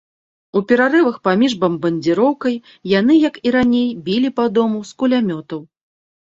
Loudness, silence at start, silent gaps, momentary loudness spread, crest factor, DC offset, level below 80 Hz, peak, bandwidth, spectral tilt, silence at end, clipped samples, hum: -16 LUFS; 0.55 s; none; 9 LU; 16 dB; under 0.1%; -56 dBFS; -2 dBFS; 7.8 kHz; -6.5 dB/octave; 0.65 s; under 0.1%; none